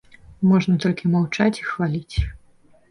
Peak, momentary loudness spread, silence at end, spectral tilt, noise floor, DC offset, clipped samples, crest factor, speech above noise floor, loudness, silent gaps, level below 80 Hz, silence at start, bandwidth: -6 dBFS; 9 LU; 0.55 s; -7 dB/octave; -53 dBFS; under 0.1%; under 0.1%; 16 dB; 33 dB; -21 LUFS; none; -36 dBFS; 0.3 s; 11 kHz